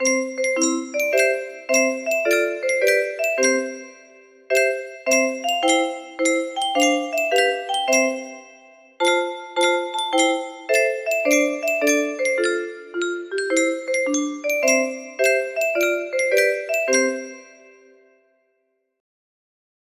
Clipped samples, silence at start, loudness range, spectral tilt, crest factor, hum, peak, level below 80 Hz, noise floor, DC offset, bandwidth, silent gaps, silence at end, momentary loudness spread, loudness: under 0.1%; 0 s; 2 LU; 0 dB/octave; 18 dB; none; -4 dBFS; -72 dBFS; -71 dBFS; under 0.1%; 15.5 kHz; none; 2.55 s; 8 LU; -20 LUFS